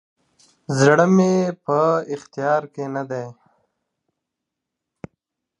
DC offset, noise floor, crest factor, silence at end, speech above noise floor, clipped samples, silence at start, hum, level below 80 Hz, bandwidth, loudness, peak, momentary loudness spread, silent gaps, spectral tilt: under 0.1%; -82 dBFS; 20 dB; 2.3 s; 64 dB; under 0.1%; 0.7 s; none; -68 dBFS; 11 kHz; -19 LUFS; -2 dBFS; 15 LU; none; -6.5 dB/octave